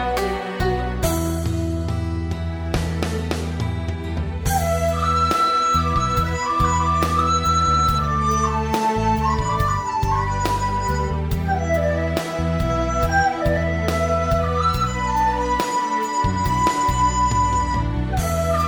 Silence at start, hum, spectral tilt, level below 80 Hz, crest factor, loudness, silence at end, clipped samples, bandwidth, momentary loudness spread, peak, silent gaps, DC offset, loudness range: 0 s; none; -5.5 dB/octave; -28 dBFS; 14 dB; -21 LUFS; 0 s; under 0.1%; over 20 kHz; 6 LU; -6 dBFS; none; under 0.1%; 5 LU